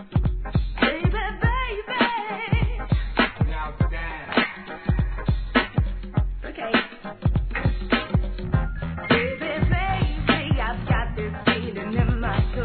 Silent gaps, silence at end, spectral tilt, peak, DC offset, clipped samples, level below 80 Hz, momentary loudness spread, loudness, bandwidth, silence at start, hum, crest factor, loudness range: none; 0 s; -10 dB/octave; -4 dBFS; 0.2%; under 0.1%; -28 dBFS; 5 LU; -24 LUFS; 4.5 kHz; 0 s; none; 18 dB; 2 LU